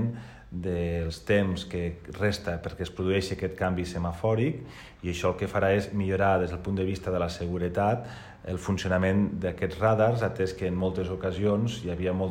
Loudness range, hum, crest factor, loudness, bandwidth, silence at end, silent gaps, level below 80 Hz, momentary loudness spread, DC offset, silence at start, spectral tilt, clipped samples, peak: 3 LU; none; 16 dB; -28 LUFS; 16 kHz; 0 s; none; -46 dBFS; 10 LU; under 0.1%; 0 s; -7 dB/octave; under 0.1%; -12 dBFS